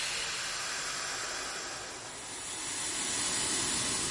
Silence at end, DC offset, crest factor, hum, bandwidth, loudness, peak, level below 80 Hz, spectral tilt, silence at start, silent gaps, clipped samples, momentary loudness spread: 0 s; under 0.1%; 16 dB; none; 11.5 kHz; -33 LUFS; -20 dBFS; -60 dBFS; -0.5 dB/octave; 0 s; none; under 0.1%; 10 LU